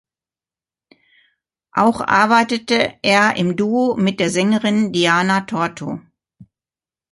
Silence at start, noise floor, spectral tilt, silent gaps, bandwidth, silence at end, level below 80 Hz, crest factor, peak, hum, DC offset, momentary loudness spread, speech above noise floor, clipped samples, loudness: 1.75 s; under -90 dBFS; -4.5 dB/octave; none; 11.5 kHz; 0.7 s; -58 dBFS; 18 dB; 0 dBFS; none; under 0.1%; 9 LU; over 74 dB; under 0.1%; -16 LUFS